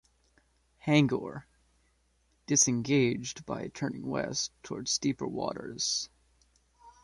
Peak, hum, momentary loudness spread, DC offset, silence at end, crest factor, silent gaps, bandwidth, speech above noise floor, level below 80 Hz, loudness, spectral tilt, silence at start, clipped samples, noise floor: -12 dBFS; none; 13 LU; under 0.1%; 0.15 s; 22 dB; none; 11.5 kHz; 40 dB; -64 dBFS; -30 LUFS; -3.5 dB/octave; 0.85 s; under 0.1%; -71 dBFS